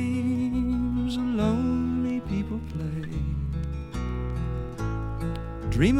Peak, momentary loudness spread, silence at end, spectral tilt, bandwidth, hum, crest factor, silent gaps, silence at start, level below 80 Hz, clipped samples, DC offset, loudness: -10 dBFS; 8 LU; 0 s; -7.5 dB/octave; 11.5 kHz; none; 18 dB; none; 0 s; -34 dBFS; under 0.1%; under 0.1%; -29 LUFS